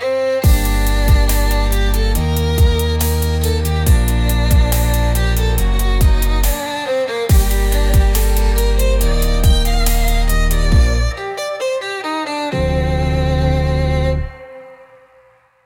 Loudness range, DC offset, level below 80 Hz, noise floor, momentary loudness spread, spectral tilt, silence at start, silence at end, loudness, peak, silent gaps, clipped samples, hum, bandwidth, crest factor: 3 LU; under 0.1%; -16 dBFS; -51 dBFS; 6 LU; -5 dB/octave; 0 s; 0.9 s; -16 LUFS; -2 dBFS; none; under 0.1%; none; 18.5 kHz; 12 dB